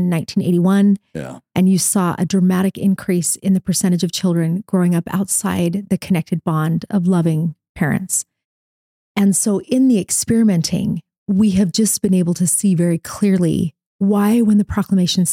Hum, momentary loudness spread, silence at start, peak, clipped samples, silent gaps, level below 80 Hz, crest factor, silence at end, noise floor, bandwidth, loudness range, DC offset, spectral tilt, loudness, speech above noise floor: none; 7 LU; 0 s; -4 dBFS; under 0.1%; 7.69-7.75 s, 8.45-9.15 s, 11.18-11.26 s, 13.86-13.99 s; -48 dBFS; 12 dB; 0 s; under -90 dBFS; 16 kHz; 3 LU; under 0.1%; -5.5 dB/octave; -17 LUFS; over 74 dB